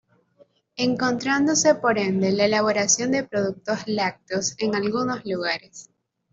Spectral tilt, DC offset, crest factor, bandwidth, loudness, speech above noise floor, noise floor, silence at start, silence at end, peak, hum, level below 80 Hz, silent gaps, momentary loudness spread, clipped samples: -3.5 dB/octave; under 0.1%; 18 dB; 8 kHz; -22 LUFS; 36 dB; -59 dBFS; 0.8 s; 0.5 s; -6 dBFS; none; -64 dBFS; none; 8 LU; under 0.1%